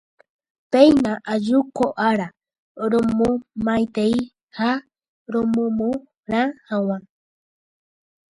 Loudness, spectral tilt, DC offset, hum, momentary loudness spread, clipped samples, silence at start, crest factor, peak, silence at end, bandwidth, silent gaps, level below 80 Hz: -21 LUFS; -6.5 dB/octave; under 0.1%; none; 12 LU; under 0.1%; 0.7 s; 20 dB; 0 dBFS; 1.3 s; 11 kHz; 2.58-2.75 s, 4.43-4.47 s, 5.08-5.26 s, 6.19-6.23 s; -54 dBFS